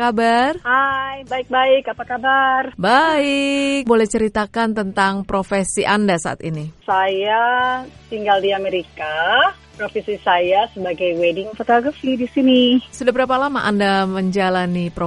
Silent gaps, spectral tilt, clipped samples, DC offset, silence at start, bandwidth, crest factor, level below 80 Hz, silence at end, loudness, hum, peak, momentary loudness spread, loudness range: none; -4.5 dB/octave; under 0.1%; under 0.1%; 0 s; 11.5 kHz; 16 dB; -48 dBFS; 0 s; -17 LUFS; none; 0 dBFS; 9 LU; 2 LU